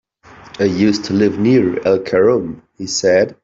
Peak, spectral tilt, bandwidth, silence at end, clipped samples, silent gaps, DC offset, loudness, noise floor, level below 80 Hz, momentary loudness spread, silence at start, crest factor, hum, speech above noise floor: -2 dBFS; -5.5 dB/octave; 8 kHz; 0.1 s; under 0.1%; none; under 0.1%; -15 LUFS; -42 dBFS; -52 dBFS; 7 LU; 0.45 s; 14 dB; none; 27 dB